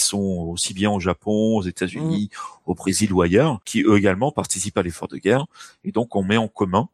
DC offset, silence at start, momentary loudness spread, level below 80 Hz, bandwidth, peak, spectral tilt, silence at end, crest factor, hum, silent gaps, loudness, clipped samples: under 0.1%; 0 s; 9 LU; -50 dBFS; 16 kHz; -2 dBFS; -5 dB/octave; 0.05 s; 18 dB; none; none; -21 LUFS; under 0.1%